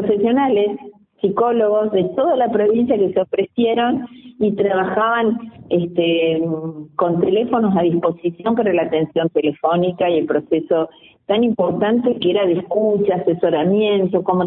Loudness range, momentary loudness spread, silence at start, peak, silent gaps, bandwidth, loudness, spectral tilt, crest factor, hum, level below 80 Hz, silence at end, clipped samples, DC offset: 1 LU; 5 LU; 0 s; -4 dBFS; none; 4 kHz; -18 LUFS; -12 dB/octave; 14 dB; none; -58 dBFS; 0 s; under 0.1%; under 0.1%